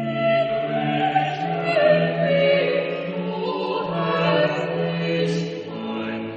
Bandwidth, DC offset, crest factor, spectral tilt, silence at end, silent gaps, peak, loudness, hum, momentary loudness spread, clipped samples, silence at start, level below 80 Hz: 8.4 kHz; under 0.1%; 16 dB; -7 dB/octave; 0 s; none; -6 dBFS; -22 LUFS; none; 9 LU; under 0.1%; 0 s; -62 dBFS